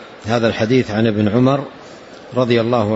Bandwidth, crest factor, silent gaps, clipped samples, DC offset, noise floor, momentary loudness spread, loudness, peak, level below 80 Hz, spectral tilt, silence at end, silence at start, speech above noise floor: 8 kHz; 14 dB; none; under 0.1%; under 0.1%; -37 dBFS; 20 LU; -16 LUFS; -2 dBFS; -52 dBFS; -7 dB/octave; 0 s; 0 s; 22 dB